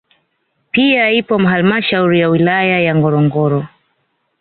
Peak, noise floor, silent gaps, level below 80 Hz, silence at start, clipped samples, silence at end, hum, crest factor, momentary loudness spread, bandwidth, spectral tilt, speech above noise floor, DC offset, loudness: -2 dBFS; -65 dBFS; none; -54 dBFS; 0.75 s; under 0.1%; 0.75 s; none; 12 dB; 5 LU; 4.5 kHz; -11 dB/octave; 53 dB; under 0.1%; -13 LUFS